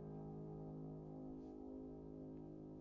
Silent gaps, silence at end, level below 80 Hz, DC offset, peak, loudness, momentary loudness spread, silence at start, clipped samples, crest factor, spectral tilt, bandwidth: none; 0 s; -66 dBFS; under 0.1%; -42 dBFS; -53 LUFS; 2 LU; 0 s; under 0.1%; 10 dB; -11.5 dB/octave; 6.6 kHz